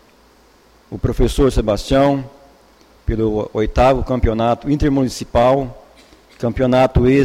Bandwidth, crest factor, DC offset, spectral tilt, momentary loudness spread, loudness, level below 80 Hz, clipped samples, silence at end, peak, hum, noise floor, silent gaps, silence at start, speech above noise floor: 15 kHz; 14 dB; under 0.1%; -7 dB/octave; 10 LU; -17 LUFS; -26 dBFS; under 0.1%; 0 s; -2 dBFS; none; -50 dBFS; none; 0.9 s; 35 dB